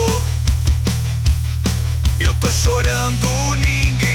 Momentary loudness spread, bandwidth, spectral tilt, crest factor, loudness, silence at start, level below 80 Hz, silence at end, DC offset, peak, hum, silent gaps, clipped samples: 3 LU; 19 kHz; -4.5 dB/octave; 10 dB; -18 LUFS; 0 s; -22 dBFS; 0 s; under 0.1%; -6 dBFS; none; none; under 0.1%